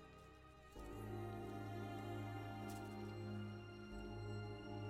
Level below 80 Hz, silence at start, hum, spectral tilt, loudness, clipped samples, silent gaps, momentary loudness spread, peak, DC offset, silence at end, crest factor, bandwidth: -64 dBFS; 0 s; none; -7 dB/octave; -51 LUFS; under 0.1%; none; 11 LU; -38 dBFS; under 0.1%; 0 s; 12 dB; 15.5 kHz